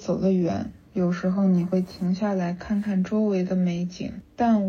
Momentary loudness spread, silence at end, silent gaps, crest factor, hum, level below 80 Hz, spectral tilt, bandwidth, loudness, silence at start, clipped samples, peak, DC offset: 9 LU; 0 s; none; 12 dB; none; -54 dBFS; -8.5 dB/octave; 6.8 kHz; -25 LUFS; 0 s; under 0.1%; -12 dBFS; under 0.1%